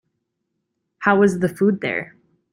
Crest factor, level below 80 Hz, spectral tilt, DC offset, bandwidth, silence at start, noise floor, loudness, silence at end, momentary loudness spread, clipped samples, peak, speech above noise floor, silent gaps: 20 dB; -60 dBFS; -7 dB/octave; under 0.1%; 15 kHz; 1 s; -76 dBFS; -19 LUFS; 0.45 s; 11 LU; under 0.1%; -2 dBFS; 58 dB; none